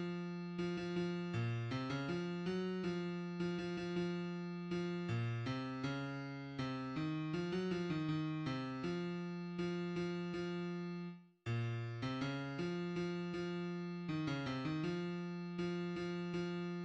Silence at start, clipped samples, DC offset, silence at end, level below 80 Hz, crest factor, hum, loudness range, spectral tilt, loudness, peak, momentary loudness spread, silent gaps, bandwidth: 0 s; under 0.1%; under 0.1%; 0 s; -70 dBFS; 12 dB; none; 1 LU; -7 dB/octave; -42 LUFS; -28 dBFS; 4 LU; none; 8.4 kHz